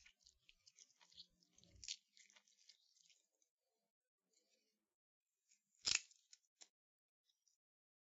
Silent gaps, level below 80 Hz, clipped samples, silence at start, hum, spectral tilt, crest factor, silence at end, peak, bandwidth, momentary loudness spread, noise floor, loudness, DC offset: 3.50-3.58 s, 3.90-4.01 s, 4.08-4.18 s, 4.95-5.21 s; -84 dBFS; under 0.1%; 0.8 s; none; 2.5 dB/octave; 36 dB; 2.1 s; -20 dBFS; 7.6 kHz; 28 LU; -86 dBFS; -44 LUFS; under 0.1%